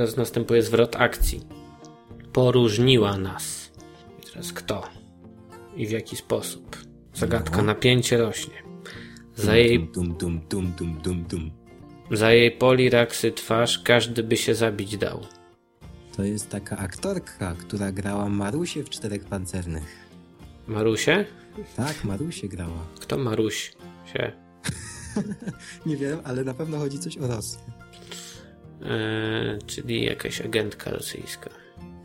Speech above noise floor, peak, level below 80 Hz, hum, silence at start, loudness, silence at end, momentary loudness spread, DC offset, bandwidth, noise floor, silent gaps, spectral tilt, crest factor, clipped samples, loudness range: 27 dB; -2 dBFS; -44 dBFS; none; 0 s; -25 LUFS; 0 s; 20 LU; under 0.1%; 16.5 kHz; -51 dBFS; none; -5 dB/octave; 24 dB; under 0.1%; 10 LU